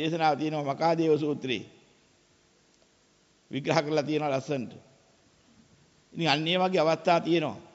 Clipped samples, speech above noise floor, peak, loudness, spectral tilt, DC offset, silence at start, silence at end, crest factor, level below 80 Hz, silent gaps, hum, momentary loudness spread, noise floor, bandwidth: under 0.1%; 38 dB; -8 dBFS; -27 LUFS; -5.5 dB/octave; under 0.1%; 0 s; 0.1 s; 20 dB; -72 dBFS; none; none; 10 LU; -65 dBFS; 8 kHz